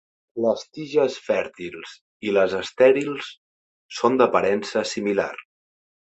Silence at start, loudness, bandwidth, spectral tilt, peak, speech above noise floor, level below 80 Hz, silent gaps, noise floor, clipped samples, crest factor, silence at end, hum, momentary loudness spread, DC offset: 0.35 s; -22 LUFS; 8.2 kHz; -4.5 dB/octave; -4 dBFS; over 68 dB; -64 dBFS; 2.01-2.20 s, 3.38-3.89 s; under -90 dBFS; under 0.1%; 20 dB; 0.7 s; none; 18 LU; under 0.1%